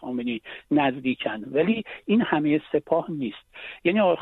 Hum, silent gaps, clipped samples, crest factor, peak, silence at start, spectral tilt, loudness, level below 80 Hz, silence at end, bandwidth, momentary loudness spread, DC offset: none; none; under 0.1%; 18 dB; -6 dBFS; 0 s; -8.5 dB/octave; -25 LUFS; -62 dBFS; 0 s; 4.1 kHz; 10 LU; under 0.1%